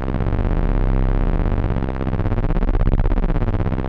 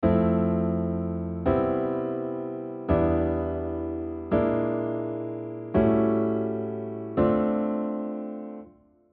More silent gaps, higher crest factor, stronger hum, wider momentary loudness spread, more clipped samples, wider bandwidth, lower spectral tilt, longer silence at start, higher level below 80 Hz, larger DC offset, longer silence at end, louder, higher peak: neither; about the same, 16 dB vs 16 dB; first, 50 Hz at -30 dBFS vs none; second, 2 LU vs 11 LU; neither; about the same, 4.2 kHz vs 4.2 kHz; about the same, -10 dB/octave vs -9 dB/octave; about the same, 0 s vs 0 s; first, -20 dBFS vs -46 dBFS; neither; second, 0 s vs 0.45 s; first, -22 LUFS vs -27 LUFS; first, -2 dBFS vs -10 dBFS